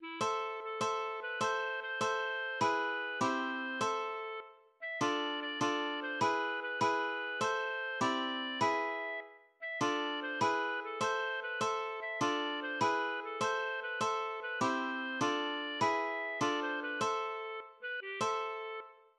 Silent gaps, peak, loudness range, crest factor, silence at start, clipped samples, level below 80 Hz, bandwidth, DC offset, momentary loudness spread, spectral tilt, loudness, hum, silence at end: none; -20 dBFS; 1 LU; 16 dB; 0 s; under 0.1%; -82 dBFS; 12 kHz; under 0.1%; 7 LU; -3 dB/octave; -35 LUFS; none; 0.25 s